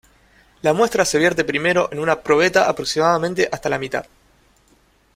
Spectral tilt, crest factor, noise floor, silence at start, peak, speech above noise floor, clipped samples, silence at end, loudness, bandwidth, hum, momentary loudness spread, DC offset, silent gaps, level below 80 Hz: -4 dB/octave; 18 dB; -57 dBFS; 0.65 s; -2 dBFS; 39 dB; under 0.1%; 1.15 s; -18 LUFS; 16 kHz; none; 7 LU; under 0.1%; none; -52 dBFS